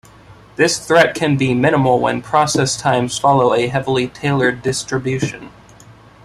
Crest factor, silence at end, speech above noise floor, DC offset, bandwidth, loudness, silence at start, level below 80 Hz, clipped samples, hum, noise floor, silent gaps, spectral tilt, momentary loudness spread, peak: 16 dB; 0.75 s; 27 dB; under 0.1%; 13.5 kHz; -16 LUFS; 0.3 s; -48 dBFS; under 0.1%; none; -43 dBFS; none; -4.5 dB/octave; 8 LU; 0 dBFS